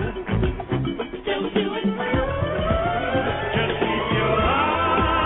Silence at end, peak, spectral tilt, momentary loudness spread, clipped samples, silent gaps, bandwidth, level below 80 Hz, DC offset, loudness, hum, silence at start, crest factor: 0 s; -8 dBFS; -10 dB/octave; 6 LU; under 0.1%; none; 4.1 kHz; -34 dBFS; under 0.1%; -23 LUFS; none; 0 s; 14 dB